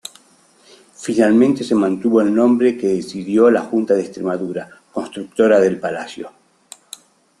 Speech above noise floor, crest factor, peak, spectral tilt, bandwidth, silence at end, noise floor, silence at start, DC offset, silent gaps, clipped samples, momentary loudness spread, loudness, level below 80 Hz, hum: 37 dB; 16 dB; -2 dBFS; -6 dB/octave; 12 kHz; 1.1 s; -53 dBFS; 1 s; under 0.1%; none; under 0.1%; 20 LU; -17 LUFS; -60 dBFS; none